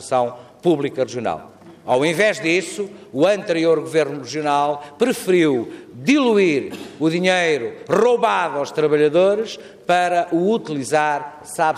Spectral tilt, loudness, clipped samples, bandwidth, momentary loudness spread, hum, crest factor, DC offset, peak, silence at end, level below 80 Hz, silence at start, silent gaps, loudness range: -5 dB/octave; -19 LUFS; under 0.1%; 15 kHz; 10 LU; none; 14 dB; under 0.1%; -4 dBFS; 0 s; -66 dBFS; 0 s; none; 2 LU